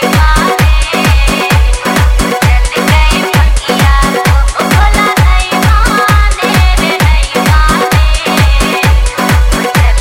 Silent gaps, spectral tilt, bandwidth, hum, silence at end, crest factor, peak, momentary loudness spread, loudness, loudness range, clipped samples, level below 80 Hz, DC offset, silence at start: none; -4.5 dB/octave; 16.5 kHz; none; 0 s; 8 dB; 0 dBFS; 2 LU; -9 LUFS; 1 LU; 0.2%; -10 dBFS; under 0.1%; 0 s